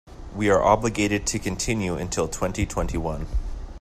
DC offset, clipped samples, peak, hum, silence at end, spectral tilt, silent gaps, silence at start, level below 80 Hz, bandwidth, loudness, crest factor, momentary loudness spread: under 0.1%; under 0.1%; -4 dBFS; none; 0 s; -4.5 dB/octave; none; 0.05 s; -34 dBFS; 15 kHz; -24 LUFS; 20 dB; 12 LU